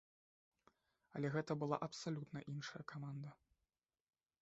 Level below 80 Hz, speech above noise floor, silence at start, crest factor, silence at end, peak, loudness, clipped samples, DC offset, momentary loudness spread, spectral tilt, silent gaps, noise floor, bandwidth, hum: -82 dBFS; over 45 dB; 1.15 s; 24 dB; 1.05 s; -24 dBFS; -46 LUFS; under 0.1%; under 0.1%; 10 LU; -6 dB/octave; none; under -90 dBFS; 8 kHz; none